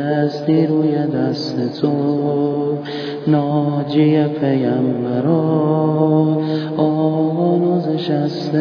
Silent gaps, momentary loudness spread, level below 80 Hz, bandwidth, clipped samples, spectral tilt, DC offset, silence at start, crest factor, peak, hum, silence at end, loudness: none; 5 LU; -64 dBFS; 5.4 kHz; under 0.1%; -9 dB/octave; under 0.1%; 0 s; 14 dB; -4 dBFS; none; 0 s; -17 LUFS